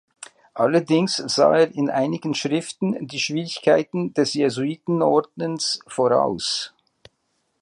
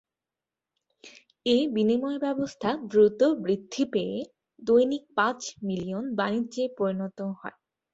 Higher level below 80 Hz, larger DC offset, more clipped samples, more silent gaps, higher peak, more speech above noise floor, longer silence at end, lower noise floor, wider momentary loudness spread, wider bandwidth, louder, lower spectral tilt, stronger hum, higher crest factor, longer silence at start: about the same, -66 dBFS vs -68 dBFS; neither; neither; neither; first, -4 dBFS vs -10 dBFS; second, 50 dB vs 64 dB; first, 0.95 s vs 0.45 s; second, -71 dBFS vs -90 dBFS; second, 8 LU vs 13 LU; first, 11.5 kHz vs 8 kHz; first, -21 LUFS vs -27 LUFS; about the same, -4.5 dB/octave vs -5.5 dB/octave; neither; about the same, 18 dB vs 18 dB; second, 0.2 s vs 1.05 s